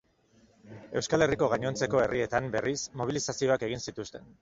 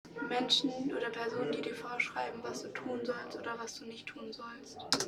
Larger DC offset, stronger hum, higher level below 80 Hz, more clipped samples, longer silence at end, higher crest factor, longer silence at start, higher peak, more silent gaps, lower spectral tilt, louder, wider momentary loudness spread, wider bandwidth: neither; neither; first, -56 dBFS vs -74 dBFS; neither; first, 0.15 s vs 0 s; second, 20 dB vs 26 dB; first, 0.65 s vs 0.05 s; about the same, -10 dBFS vs -12 dBFS; neither; first, -4.5 dB/octave vs -2.5 dB/octave; first, -29 LUFS vs -36 LUFS; second, 11 LU vs 15 LU; second, 7.8 kHz vs 17.5 kHz